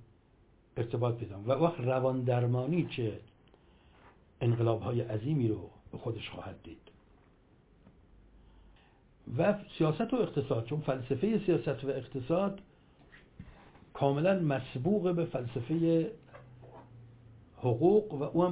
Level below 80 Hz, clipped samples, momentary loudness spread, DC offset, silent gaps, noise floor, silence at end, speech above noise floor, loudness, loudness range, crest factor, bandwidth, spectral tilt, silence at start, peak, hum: -62 dBFS; under 0.1%; 19 LU; under 0.1%; none; -64 dBFS; 0 s; 33 dB; -32 LUFS; 7 LU; 20 dB; 4 kHz; -7.5 dB/octave; 0 s; -12 dBFS; none